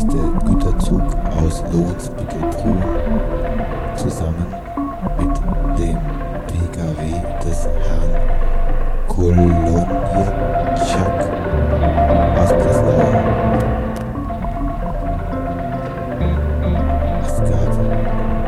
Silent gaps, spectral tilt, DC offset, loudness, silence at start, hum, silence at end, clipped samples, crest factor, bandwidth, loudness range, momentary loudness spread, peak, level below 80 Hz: none; -7.5 dB/octave; under 0.1%; -19 LUFS; 0 s; none; 0 s; under 0.1%; 16 dB; 12 kHz; 6 LU; 9 LU; 0 dBFS; -20 dBFS